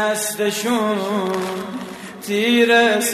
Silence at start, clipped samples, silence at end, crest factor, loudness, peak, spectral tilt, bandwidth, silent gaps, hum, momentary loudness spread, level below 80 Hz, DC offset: 0 s; under 0.1%; 0 s; 14 dB; -18 LUFS; -4 dBFS; -3 dB/octave; 14 kHz; none; none; 16 LU; -64 dBFS; under 0.1%